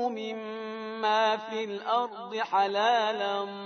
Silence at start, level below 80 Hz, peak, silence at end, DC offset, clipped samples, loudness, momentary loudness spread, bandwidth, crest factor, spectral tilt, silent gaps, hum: 0 s; under -90 dBFS; -12 dBFS; 0 s; under 0.1%; under 0.1%; -29 LUFS; 11 LU; 6.6 kHz; 16 dB; -3.5 dB/octave; none; none